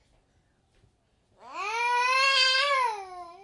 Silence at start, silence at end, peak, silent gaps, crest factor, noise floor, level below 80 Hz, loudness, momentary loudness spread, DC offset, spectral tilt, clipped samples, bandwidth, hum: 1.45 s; 0.1 s; -12 dBFS; none; 18 dB; -68 dBFS; -72 dBFS; -23 LUFS; 19 LU; under 0.1%; 2 dB/octave; under 0.1%; 11.5 kHz; none